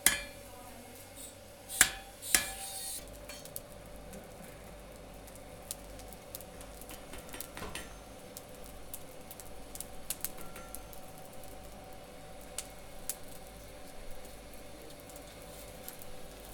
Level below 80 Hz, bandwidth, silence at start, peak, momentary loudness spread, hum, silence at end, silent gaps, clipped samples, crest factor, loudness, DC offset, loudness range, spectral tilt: -54 dBFS; over 20 kHz; 0 s; -4 dBFS; 20 LU; none; 0 s; none; under 0.1%; 36 dB; -39 LUFS; under 0.1%; 14 LU; -1 dB/octave